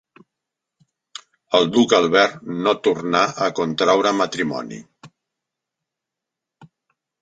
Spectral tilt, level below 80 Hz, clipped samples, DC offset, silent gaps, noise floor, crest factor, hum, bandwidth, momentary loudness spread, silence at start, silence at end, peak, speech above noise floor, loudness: -4 dB/octave; -64 dBFS; under 0.1%; under 0.1%; none; -85 dBFS; 20 dB; none; 9.2 kHz; 23 LU; 1.5 s; 2.15 s; -2 dBFS; 66 dB; -18 LUFS